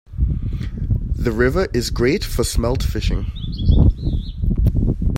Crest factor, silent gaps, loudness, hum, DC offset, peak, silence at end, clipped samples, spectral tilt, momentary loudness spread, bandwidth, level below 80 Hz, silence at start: 16 dB; none; -20 LUFS; none; under 0.1%; -2 dBFS; 0 s; under 0.1%; -6 dB/octave; 8 LU; 16.5 kHz; -22 dBFS; 0.1 s